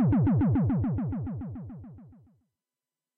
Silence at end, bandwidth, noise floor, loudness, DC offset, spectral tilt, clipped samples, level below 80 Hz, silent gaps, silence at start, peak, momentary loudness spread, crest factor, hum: 1.1 s; 3.3 kHz; under -90 dBFS; -27 LUFS; under 0.1%; -13.5 dB/octave; under 0.1%; -46 dBFS; none; 0 s; -20 dBFS; 20 LU; 10 dB; none